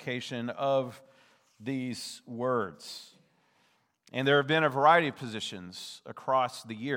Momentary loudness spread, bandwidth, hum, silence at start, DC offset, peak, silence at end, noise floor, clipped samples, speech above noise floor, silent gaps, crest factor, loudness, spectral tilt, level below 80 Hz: 19 LU; 17 kHz; none; 0 s; under 0.1%; -8 dBFS; 0 s; -70 dBFS; under 0.1%; 41 dB; none; 22 dB; -29 LUFS; -5 dB/octave; -84 dBFS